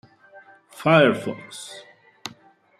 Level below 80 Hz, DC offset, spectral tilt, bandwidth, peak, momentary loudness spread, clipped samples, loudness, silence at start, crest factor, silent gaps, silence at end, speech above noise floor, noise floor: -68 dBFS; under 0.1%; -5.5 dB/octave; 14 kHz; -2 dBFS; 22 LU; under 0.1%; -19 LUFS; 0.8 s; 22 dB; none; 0.5 s; 33 dB; -53 dBFS